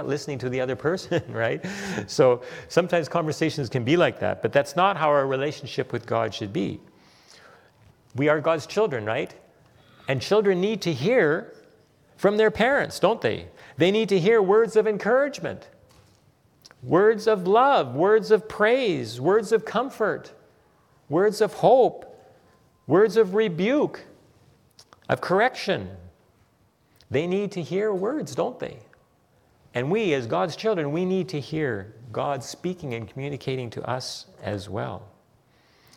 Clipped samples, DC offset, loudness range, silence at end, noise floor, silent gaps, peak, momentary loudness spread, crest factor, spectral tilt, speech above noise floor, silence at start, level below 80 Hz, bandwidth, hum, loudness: under 0.1%; under 0.1%; 7 LU; 0.9 s; -63 dBFS; none; -4 dBFS; 13 LU; 20 dB; -6 dB/octave; 40 dB; 0 s; -64 dBFS; 14 kHz; none; -24 LUFS